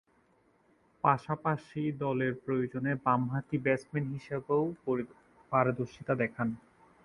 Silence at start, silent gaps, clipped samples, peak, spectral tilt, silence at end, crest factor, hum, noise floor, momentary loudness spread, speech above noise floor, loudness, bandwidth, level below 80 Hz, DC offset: 1.05 s; none; under 0.1%; -10 dBFS; -8.5 dB/octave; 0.45 s; 22 dB; none; -68 dBFS; 7 LU; 37 dB; -32 LUFS; 11 kHz; -66 dBFS; under 0.1%